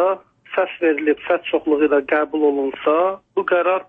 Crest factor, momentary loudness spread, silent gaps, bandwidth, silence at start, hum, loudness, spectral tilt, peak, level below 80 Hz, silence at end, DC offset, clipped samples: 14 dB; 6 LU; none; 3.8 kHz; 0 s; none; -19 LUFS; -7 dB/octave; -4 dBFS; -62 dBFS; 0.05 s; under 0.1%; under 0.1%